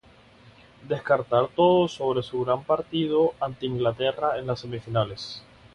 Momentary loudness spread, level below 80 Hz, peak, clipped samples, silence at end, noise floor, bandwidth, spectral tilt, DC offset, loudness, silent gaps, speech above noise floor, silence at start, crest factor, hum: 11 LU; -58 dBFS; -6 dBFS; under 0.1%; 0.35 s; -53 dBFS; 10.5 kHz; -7 dB/octave; under 0.1%; -25 LUFS; none; 28 dB; 0.8 s; 18 dB; none